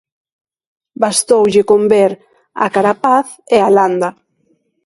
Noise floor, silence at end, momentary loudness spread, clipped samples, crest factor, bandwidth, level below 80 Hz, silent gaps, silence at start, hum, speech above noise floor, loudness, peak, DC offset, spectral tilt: -60 dBFS; 0.75 s; 9 LU; under 0.1%; 14 dB; 11.5 kHz; -58 dBFS; none; 1 s; none; 48 dB; -13 LUFS; 0 dBFS; under 0.1%; -4 dB/octave